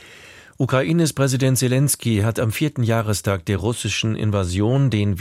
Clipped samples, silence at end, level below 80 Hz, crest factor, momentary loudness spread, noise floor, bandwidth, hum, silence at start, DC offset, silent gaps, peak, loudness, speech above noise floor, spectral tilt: under 0.1%; 0 s; -46 dBFS; 14 dB; 4 LU; -44 dBFS; 16 kHz; none; 0 s; under 0.1%; none; -4 dBFS; -20 LUFS; 25 dB; -5.5 dB/octave